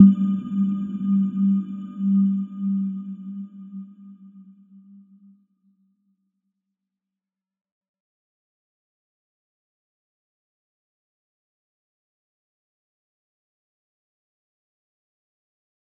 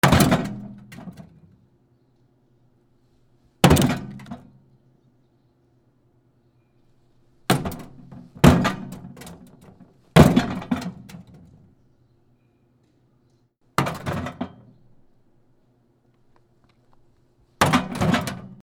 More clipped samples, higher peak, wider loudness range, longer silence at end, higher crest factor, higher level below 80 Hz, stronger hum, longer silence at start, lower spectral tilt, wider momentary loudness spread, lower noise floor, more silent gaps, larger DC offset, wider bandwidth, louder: neither; about the same, -2 dBFS vs 0 dBFS; first, 20 LU vs 14 LU; first, 11.6 s vs 0.1 s; about the same, 26 dB vs 24 dB; second, -76 dBFS vs -42 dBFS; neither; about the same, 0 s vs 0.05 s; first, -12 dB/octave vs -5.5 dB/octave; second, 17 LU vs 26 LU; first, -88 dBFS vs -63 dBFS; neither; neither; second, 3.2 kHz vs over 20 kHz; about the same, -23 LUFS vs -21 LUFS